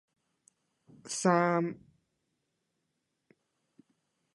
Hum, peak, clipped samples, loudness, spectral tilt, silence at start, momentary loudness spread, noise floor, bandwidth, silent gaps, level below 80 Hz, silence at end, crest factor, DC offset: none; -12 dBFS; under 0.1%; -30 LUFS; -5 dB/octave; 1.05 s; 14 LU; -82 dBFS; 11.5 kHz; none; -80 dBFS; 2.6 s; 24 dB; under 0.1%